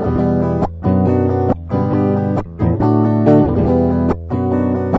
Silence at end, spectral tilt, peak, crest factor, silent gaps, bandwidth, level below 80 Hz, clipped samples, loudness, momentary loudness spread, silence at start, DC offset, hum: 0 s; -11 dB/octave; -2 dBFS; 14 dB; none; 6 kHz; -32 dBFS; under 0.1%; -15 LUFS; 6 LU; 0 s; under 0.1%; none